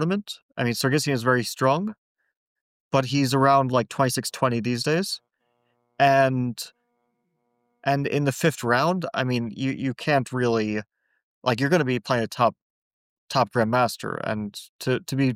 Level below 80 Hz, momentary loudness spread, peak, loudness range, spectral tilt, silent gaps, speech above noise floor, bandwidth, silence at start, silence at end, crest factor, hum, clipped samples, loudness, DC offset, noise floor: -64 dBFS; 10 LU; -8 dBFS; 3 LU; -5.5 dB/octave; 0.42-0.49 s, 1.98-2.15 s, 2.37-2.91 s, 11.23-11.41 s, 12.62-13.28 s, 14.69-14.79 s; 50 dB; 16.5 kHz; 0 s; 0 s; 16 dB; none; under 0.1%; -24 LUFS; under 0.1%; -73 dBFS